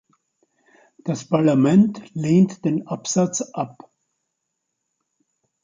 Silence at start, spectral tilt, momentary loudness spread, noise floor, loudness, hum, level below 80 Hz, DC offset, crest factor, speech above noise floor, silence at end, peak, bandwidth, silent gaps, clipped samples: 1.05 s; -6.5 dB/octave; 13 LU; -78 dBFS; -20 LUFS; none; -64 dBFS; under 0.1%; 18 dB; 59 dB; 1.95 s; -6 dBFS; 9.4 kHz; none; under 0.1%